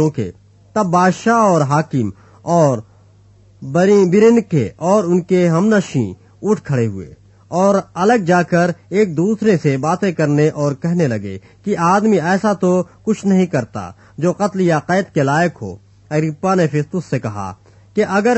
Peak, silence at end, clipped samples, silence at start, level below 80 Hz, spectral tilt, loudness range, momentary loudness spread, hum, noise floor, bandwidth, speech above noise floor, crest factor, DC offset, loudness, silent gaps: 0 dBFS; 0 s; under 0.1%; 0 s; -54 dBFS; -7 dB/octave; 3 LU; 12 LU; none; -47 dBFS; 8.4 kHz; 32 dB; 14 dB; under 0.1%; -16 LUFS; none